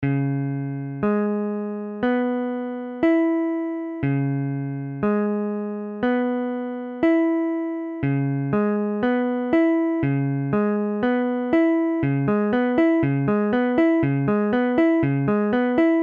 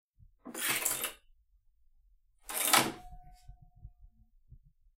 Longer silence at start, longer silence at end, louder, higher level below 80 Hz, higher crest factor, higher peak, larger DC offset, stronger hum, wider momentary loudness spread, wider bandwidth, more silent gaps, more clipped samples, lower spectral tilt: second, 0 s vs 0.45 s; second, 0 s vs 0.9 s; first, -22 LUFS vs -30 LUFS; first, -54 dBFS vs -60 dBFS; second, 14 dB vs 30 dB; about the same, -8 dBFS vs -8 dBFS; neither; neither; second, 8 LU vs 21 LU; second, 4.5 kHz vs 16.5 kHz; neither; neither; first, -10.5 dB/octave vs -0.5 dB/octave